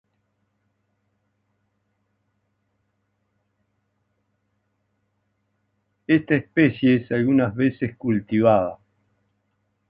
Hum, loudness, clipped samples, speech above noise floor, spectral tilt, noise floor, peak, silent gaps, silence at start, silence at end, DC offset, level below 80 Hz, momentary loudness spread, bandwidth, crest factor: none; -21 LUFS; under 0.1%; 53 dB; -10.5 dB/octave; -73 dBFS; -4 dBFS; none; 6.1 s; 1.15 s; under 0.1%; -60 dBFS; 7 LU; 5 kHz; 20 dB